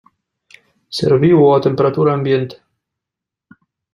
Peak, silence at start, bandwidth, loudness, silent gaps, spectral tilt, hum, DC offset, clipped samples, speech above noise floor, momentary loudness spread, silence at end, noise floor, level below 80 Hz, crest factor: -2 dBFS; 0.9 s; 11.5 kHz; -14 LUFS; none; -8 dB/octave; none; under 0.1%; under 0.1%; 71 dB; 11 LU; 1.4 s; -84 dBFS; -54 dBFS; 14 dB